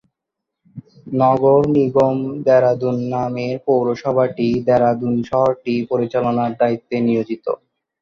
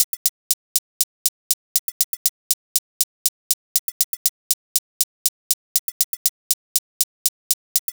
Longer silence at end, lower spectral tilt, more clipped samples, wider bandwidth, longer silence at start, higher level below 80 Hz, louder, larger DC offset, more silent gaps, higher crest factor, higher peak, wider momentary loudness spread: first, 0.45 s vs 0.1 s; first, -8.5 dB/octave vs 5.5 dB/octave; neither; second, 6.8 kHz vs over 20 kHz; first, 0.75 s vs 0 s; first, -54 dBFS vs -72 dBFS; first, -18 LUFS vs -22 LUFS; neither; second, none vs 0.04-7.88 s; second, 16 dB vs 24 dB; about the same, -2 dBFS vs 0 dBFS; first, 8 LU vs 4 LU